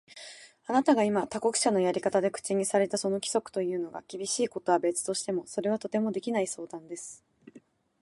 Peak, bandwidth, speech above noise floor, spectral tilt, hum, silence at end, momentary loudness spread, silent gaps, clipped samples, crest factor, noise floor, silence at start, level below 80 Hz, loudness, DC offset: -10 dBFS; 11.5 kHz; 29 dB; -4 dB/octave; none; 0.45 s; 15 LU; none; under 0.1%; 20 dB; -58 dBFS; 0.1 s; -74 dBFS; -29 LUFS; under 0.1%